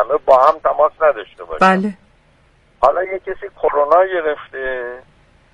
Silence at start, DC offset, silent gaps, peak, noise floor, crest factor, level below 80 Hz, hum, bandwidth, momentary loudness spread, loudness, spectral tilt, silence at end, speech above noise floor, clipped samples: 0 s; under 0.1%; none; 0 dBFS; -53 dBFS; 16 dB; -48 dBFS; none; 11 kHz; 15 LU; -16 LUFS; -6.5 dB/octave; 0.55 s; 38 dB; under 0.1%